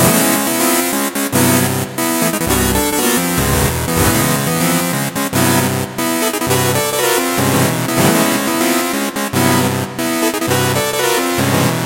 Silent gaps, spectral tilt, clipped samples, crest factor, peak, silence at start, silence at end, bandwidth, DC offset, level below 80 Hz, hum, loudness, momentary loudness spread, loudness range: none; -4 dB/octave; under 0.1%; 14 dB; 0 dBFS; 0 s; 0 s; 17 kHz; under 0.1%; -34 dBFS; none; -14 LUFS; 5 LU; 1 LU